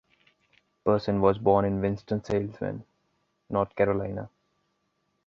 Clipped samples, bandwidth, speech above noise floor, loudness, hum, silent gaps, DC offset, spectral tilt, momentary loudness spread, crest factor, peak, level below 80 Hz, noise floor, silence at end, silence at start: under 0.1%; 7.2 kHz; 49 dB; -27 LUFS; none; none; under 0.1%; -8.5 dB/octave; 12 LU; 22 dB; -6 dBFS; -54 dBFS; -75 dBFS; 1.05 s; 0.85 s